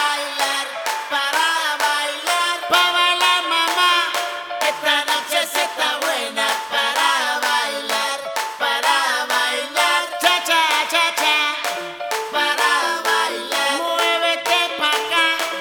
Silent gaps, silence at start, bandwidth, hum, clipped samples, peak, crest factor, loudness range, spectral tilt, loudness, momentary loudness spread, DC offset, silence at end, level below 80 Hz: none; 0 s; over 20 kHz; none; under 0.1%; 0 dBFS; 18 dB; 2 LU; 1 dB/octave; -18 LUFS; 6 LU; under 0.1%; 0 s; -70 dBFS